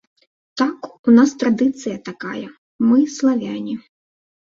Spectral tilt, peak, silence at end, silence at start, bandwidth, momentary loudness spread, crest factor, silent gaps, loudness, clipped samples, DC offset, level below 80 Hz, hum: -5.5 dB/octave; -2 dBFS; 0.7 s; 0.55 s; 7.6 kHz; 17 LU; 16 dB; 0.99-1.04 s, 2.58-2.79 s; -18 LUFS; under 0.1%; under 0.1%; -64 dBFS; none